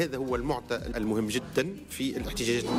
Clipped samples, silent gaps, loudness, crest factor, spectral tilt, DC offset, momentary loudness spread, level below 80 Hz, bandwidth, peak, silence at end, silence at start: under 0.1%; none; -31 LUFS; 14 dB; -4.5 dB/octave; under 0.1%; 4 LU; -46 dBFS; 16 kHz; -16 dBFS; 0 s; 0 s